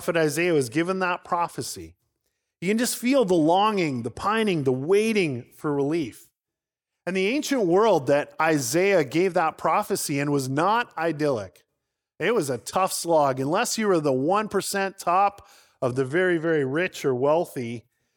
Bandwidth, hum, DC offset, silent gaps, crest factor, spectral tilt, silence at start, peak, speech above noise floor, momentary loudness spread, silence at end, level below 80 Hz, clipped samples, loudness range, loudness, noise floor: 19.5 kHz; none; under 0.1%; none; 18 dB; -4.5 dB/octave; 0 s; -6 dBFS; 65 dB; 8 LU; 0.35 s; -66 dBFS; under 0.1%; 3 LU; -24 LUFS; -89 dBFS